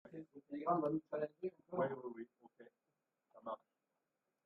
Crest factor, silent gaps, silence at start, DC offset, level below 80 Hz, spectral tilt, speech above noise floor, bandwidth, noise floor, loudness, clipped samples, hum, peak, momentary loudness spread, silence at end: 22 dB; none; 0.05 s; under 0.1%; -86 dBFS; -7.5 dB/octave; 48 dB; 5.6 kHz; -89 dBFS; -43 LUFS; under 0.1%; none; -24 dBFS; 16 LU; 0.9 s